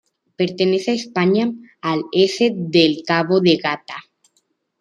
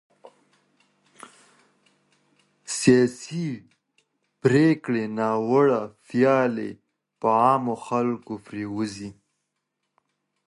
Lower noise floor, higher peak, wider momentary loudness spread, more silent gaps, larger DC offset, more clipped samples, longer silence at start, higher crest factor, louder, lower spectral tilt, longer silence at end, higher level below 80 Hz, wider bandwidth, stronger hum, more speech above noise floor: second, -67 dBFS vs -79 dBFS; about the same, -2 dBFS vs -2 dBFS; second, 10 LU vs 14 LU; neither; neither; neither; second, 0.4 s vs 1.25 s; about the same, 18 dB vs 22 dB; first, -18 LUFS vs -23 LUFS; about the same, -5.5 dB/octave vs -6 dB/octave; second, 0.8 s vs 1.35 s; about the same, -64 dBFS vs -66 dBFS; second, 10 kHz vs 11.5 kHz; neither; second, 49 dB vs 57 dB